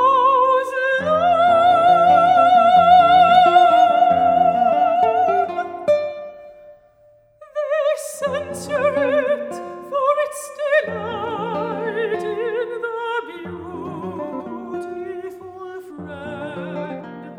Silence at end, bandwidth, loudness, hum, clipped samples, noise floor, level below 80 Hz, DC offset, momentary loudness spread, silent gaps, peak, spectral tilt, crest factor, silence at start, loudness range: 0 s; 13 kHz; -17 LUFS; none; under 0.1%; -53 dBFS; -64 dBFS; under 0.1%; 19 LU; none; -2 dBFS; -4.5 dB/octave; 16 dB; 0 s; 16 LU